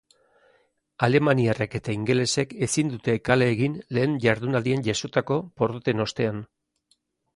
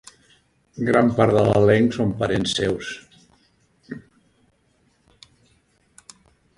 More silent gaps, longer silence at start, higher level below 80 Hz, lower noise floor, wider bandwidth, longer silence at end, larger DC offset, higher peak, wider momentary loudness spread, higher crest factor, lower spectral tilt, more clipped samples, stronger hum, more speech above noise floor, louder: neither; first, 1 s vs 0.75 s; second, -56 dBFS vs -50 dBFS; first, -69 dBFS vs -63 dBFS; about the same, 11.5 kHz vs 11.5 kHz; second, 0.9 s vs 2.6 s; neither; second, -6 dBFS vs -2 dBFS; second, 7 LU vs 23 LU; about the same, 20 dB vs 20 dB; about the same, -5.5 dB/octave vs -6 dB/octave; neither; neither; about the same, 46 dB vs 45 dB; second, -24 LUFS vs -19 LUFS